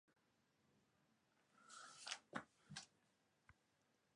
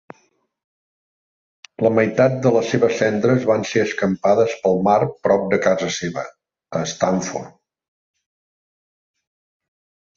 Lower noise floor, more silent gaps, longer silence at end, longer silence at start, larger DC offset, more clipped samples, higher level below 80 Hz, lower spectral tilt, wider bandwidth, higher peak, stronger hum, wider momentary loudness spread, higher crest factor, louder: first, -83 dBFS vs -63 dBFS; neither; second, 0.65 s vs 2.65 s; second, 0.1 s vs 1.8 s; neither; neither; second, -90 dBFS vs -58 dBFS; second, -2 dB/octave vs -5.5 dB/octave; first, 11 kHz vs 7.6 kHz; second, -30 dBFS vs -2 dBFS; neither; about the same, 11 LU vs 10 LU; first, 32 dB vs 18 dB; second, -55 LUFS vs -19 LUFS